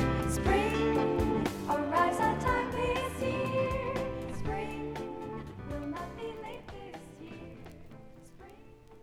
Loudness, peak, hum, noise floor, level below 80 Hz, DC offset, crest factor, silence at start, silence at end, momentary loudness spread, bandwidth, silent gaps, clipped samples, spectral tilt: -32 LUFS; -16 dBFS; none; -53 dBFS; -44 dBFS; under 0.1%; 18 dB; 0 s; 0 s; 19 LU; 17 kHz; none; under 0.1%; -6 dB/octave